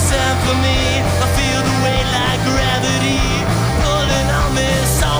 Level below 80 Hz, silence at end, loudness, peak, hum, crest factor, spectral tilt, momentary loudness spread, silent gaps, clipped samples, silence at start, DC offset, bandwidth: -24 dBFS; 0 s; -15 LUFS; -4 dBFS; none; 12 dB; -4 dB/octave; 1 LU; none; under 0.1%; 0 s; under 0.1%; over 20 kHz